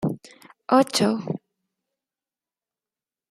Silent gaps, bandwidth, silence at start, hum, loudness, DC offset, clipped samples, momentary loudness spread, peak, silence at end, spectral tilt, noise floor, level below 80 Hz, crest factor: none; 15.5 kHz; 0 s; none; -22 LUFS; under 0.1%; under 0.1%; 18 LU; -4 dBFS; 1.95 s; -5 dB/octave; under -90 dBFS; -68 dBFS; 22 dB